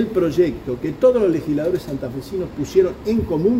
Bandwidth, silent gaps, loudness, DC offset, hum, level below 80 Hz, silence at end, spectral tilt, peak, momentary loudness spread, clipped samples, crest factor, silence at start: 16 kHz; none; -20 LUFS; under 0.1%; none; -42 dBFS; 0 s; -7.5 dB/octave; -4 dBFS; 11 LU; under 0.1%; 16 dB; 0 s